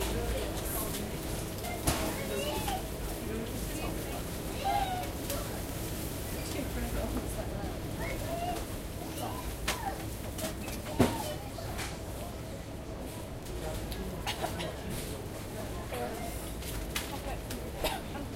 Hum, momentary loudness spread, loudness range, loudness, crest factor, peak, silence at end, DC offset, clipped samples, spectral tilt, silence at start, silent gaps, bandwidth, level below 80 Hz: none; 7 LU; 4 LU; -36 LUFS; 26 dB; -10 dBFS; 0 s; under 0.1%; under 0.1%; -4.5 dB/octave; 0 s; none; 16 kHz; -42 dBFS